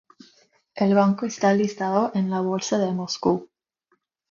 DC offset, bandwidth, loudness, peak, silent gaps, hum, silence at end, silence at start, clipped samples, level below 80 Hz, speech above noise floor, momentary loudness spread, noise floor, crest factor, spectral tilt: under 0.1%; 7.4 kHz; -23 LUFS; -6 dBFS; none; none; 0.85 s; 0.75 s; under 0.1%; -64 dBFS; 49 dB; 6 LU; -70 dBFS; 18 dB; -6 dB/octave